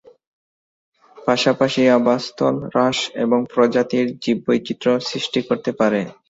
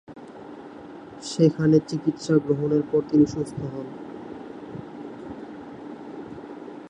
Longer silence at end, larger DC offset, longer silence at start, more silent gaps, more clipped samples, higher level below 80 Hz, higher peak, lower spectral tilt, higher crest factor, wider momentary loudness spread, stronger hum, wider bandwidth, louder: first, 0.2 s vs 0 s; neither; first, 1.15 s vs 0.1 s; neither; neither; about the same, -60 dBFS vs -58 dBFS; first, -2 dBFS vs -6 dBFS; second, -5 dB/octave vs -7.5 dB/octave; about the same, 18 dB vs 20 dB; second, 6 LU vs 21 LU; neither; second, 8 kHz vs 11 kHz; first, -19 LUFS vs -23 LUFS